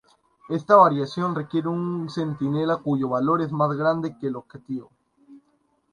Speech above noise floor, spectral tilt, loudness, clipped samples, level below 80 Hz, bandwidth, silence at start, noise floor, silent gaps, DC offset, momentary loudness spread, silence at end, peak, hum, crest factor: 44 dB; -8 dB/octave; -23 LUFS; under 0.1%; -66 dBFS; 10.5 kHz; 0.5 s; -67 dBFS; none; under 0.1%; 17 LU; 0.55 s; -4 dBFS; none; 20 dB